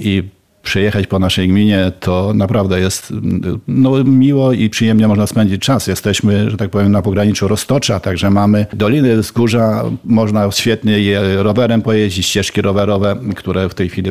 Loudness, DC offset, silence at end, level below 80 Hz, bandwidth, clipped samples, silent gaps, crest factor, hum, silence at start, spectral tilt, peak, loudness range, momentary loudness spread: -13 LUFS; 0.6%; 0 s; -40 dBFS; 15.5 kHz; under 0.1%; none; 12 dB; none; 0 s; -6 dB/octave; -2 dBFS; 2 LU; 6 LU